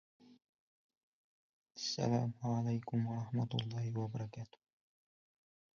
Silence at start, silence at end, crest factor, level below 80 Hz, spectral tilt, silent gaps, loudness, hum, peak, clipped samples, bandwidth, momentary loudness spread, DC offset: 0.3 s; 1.3 s; 20 dB; -74 dBFS; -6.5 dB/octave; 0.49-0.89 s, 0.97-1.66 s; -39 LUFS; none; -22 dBFS; under 0.1%; 7.4 kHz; 12 LU; under 0.1%